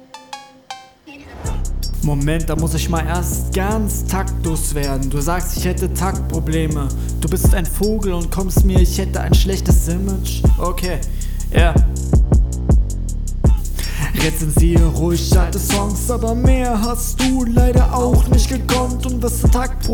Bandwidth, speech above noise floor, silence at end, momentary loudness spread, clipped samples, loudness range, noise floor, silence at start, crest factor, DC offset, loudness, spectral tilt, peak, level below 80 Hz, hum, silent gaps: 19 kHz; 24 dB; 0 s; 10 LU; under 0.1%; 4 LU; -39 dBFS; 0.15 s; 14 dB; under 0.1%; -18 LUFS; -5.5 dB/octave; -2 dBFS; -18 dBFS; none; none